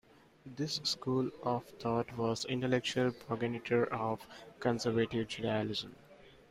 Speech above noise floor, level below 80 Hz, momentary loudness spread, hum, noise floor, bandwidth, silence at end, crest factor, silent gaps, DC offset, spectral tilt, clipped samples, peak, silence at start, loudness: 20 dB; -68 dBFS; 7 LU; none; -55 dBFS; 15.5 kHz; 0.2 s; 18 dB; none; under 0.1%; -5 dB/octave; under 0.1%; -18 dBFS; 0.45 s; -35 LUFS